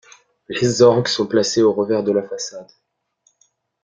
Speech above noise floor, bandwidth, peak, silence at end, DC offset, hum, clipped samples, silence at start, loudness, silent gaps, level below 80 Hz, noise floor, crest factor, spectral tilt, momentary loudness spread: 47 dB; 9.4 kHz; -2 dBFS; 1.2 s; under 0.1%; none; under 0.1%; 0.5 s; -17 LUFS; none; -58 dBFS; -64 dBFS; 18 dB; -4.5 dB/octave; 15 LU